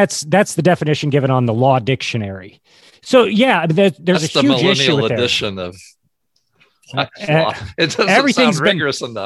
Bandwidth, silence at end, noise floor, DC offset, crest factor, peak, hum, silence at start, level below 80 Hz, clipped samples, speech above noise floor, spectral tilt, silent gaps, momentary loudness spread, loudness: 12.5 kHz; 0 s; -66 dBFS; under 0.1%; 16 dB; 0 dBFS; none; 0 s; -50 dBFS; under 0.1%; 51 dB; -5 dB/octave; none; 10 LU; -15 LUFS